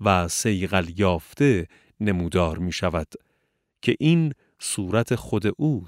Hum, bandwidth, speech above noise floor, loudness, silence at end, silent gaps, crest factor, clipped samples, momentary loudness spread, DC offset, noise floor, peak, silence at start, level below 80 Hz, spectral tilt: none; 16 kHz; 50 dB; -24 LUFS; 0 s; none; 20 dB; under 0.1%; 8 LU; under 0.1%; -73 dBFS; -4 dBFS; 0 s; -44 dBFS; -5.5 dB/octave